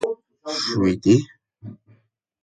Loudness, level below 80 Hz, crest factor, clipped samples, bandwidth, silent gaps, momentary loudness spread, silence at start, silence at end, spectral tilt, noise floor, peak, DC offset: -21 LUFS; -52 dBFS; 20 dB; under 0.1%; 11 kHz; none; 24 LU; 0 s; 0.7 s; -6 dB/octave; -60 dBFS; -4 dBFS; under 0.1%